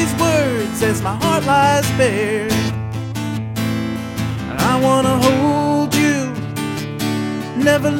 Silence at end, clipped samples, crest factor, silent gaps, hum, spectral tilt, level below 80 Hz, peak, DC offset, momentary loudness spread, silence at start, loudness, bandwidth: 0 s; under 0.1%; 16 dB; none; none; -5 dB/octave; -42 dBFS; -2 dBFS; under 0.1%; 9 LU; 0 s; -17 LUFS; 17.5 kHz